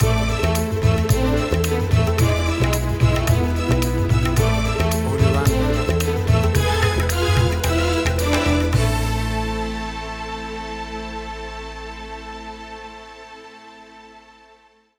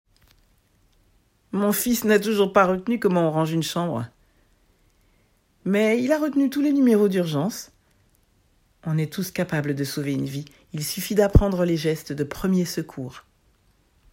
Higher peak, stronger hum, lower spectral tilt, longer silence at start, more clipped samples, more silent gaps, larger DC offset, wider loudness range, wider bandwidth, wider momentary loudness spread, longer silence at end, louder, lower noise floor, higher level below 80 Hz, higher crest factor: second, -4 dBFS vs 0 dBFS; neither; about the same, -5.5 dB/octave vs -6 dB/octave; second, 0 s vs 1.55 s; neither; neither; neither; first, 14 LU vs 5 LU; first, over 20 kHz vs 16.5 kHz; about the same, 15 LU vs 13 LU; about the same, 0.8 s vs 0.9 s; first, -20 LUFS vs -23 LUFS; second, -53 dBFS vs -63 dBFS; first, -28 dBFS vs -38 dBFS; second, 16 dB vs 22 dB